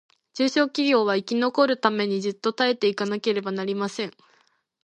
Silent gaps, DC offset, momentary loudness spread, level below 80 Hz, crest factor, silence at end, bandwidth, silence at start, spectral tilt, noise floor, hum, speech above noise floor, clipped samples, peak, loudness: none; under 0.1%; 7 LU; -76 dBFS; 20 dB; 0.75 s; 9.4 kHz; 0.35 s; -4.5 dB/octave; -65 dBFS; none; 41 dB; under 0.1%; -4 dBFS; -24 LUFS